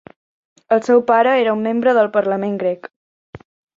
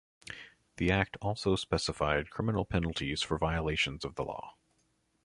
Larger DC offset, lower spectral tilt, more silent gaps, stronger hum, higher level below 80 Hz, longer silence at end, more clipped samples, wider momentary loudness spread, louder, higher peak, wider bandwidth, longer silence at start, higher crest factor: neither; first, -6.5 dB/octave vs -5 dB/octave; first, 2.96-3.33 s vs none; neither; second, -62 dBFS vs -46 dBFS; second, 0.4 s vs 0.75 s; neither; second, 8 LU vs 16 LU; first, -16 LUFS vs -32 LUFS; first, -2 dBFS vs -12 dBFS; second, 7.6 kHz vs 11.5 kHz; first, 0.7 s vs 0.25 s; second, 16 dB vs 22 dB